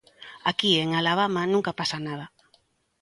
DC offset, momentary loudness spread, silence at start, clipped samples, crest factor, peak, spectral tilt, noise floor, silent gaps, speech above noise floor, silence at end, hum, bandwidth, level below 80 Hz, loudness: under 0.1%; 16 LU; 0.2 s; under 0.1%; 20 dB; -8 dBFS; -4.5 dB/octave; -66 dBFS; none; 41 dB; 0.75 s; none; 11.5 kHz; -66 dBFS; -24 LUFS